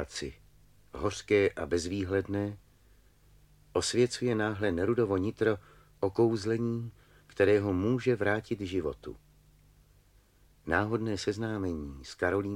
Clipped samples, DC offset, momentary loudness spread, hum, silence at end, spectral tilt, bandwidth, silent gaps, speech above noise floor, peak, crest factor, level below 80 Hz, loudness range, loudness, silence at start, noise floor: under 0.1%; under 0.1%; 13 LU; 50 Hz at -60 dBFS; 0 s; -5.5 dB/octave; 15 kHz; none; 33 dB; -12 dBFS; 20 dB; -56 dBFS; 5 LU; -31 LUFS; 0 s; -63 dBFS